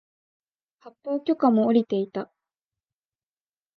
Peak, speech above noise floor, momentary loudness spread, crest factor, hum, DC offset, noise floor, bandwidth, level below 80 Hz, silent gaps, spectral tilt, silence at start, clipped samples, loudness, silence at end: -8 dBFS; over 67 dB; 17 LU; 20 dB; none; under 0.1%; under -90 dBFS; 5 kHz; -78 dBFS; none; -9 dB/octave; 0.85 s; under 0.1%; -23 LUFS; 1.55 s